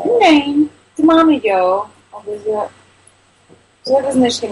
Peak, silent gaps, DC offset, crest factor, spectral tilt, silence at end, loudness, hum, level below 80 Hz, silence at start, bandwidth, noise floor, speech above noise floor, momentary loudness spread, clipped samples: -2 dBFS; none; under 0.1%; 14 dB; -4 dB/octave; 0 s; -14 LUFS; none; -56 dBFS; 0 s; 11.5 kHz; -51 dBFS; 37 dB; 18 LU; under 0.1%